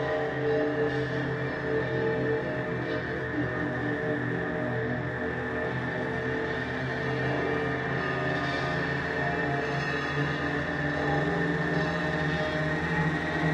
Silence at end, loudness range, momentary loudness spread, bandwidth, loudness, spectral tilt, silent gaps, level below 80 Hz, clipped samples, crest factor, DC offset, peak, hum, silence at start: 0 s; 2 LU; 3 LU; 9.8 kHz; -29 LUFS; -7 dB/octave; none; -50 dBFS; under 0.1%; 14 dB; under 0.1%; -16 dBFS; none; 0 s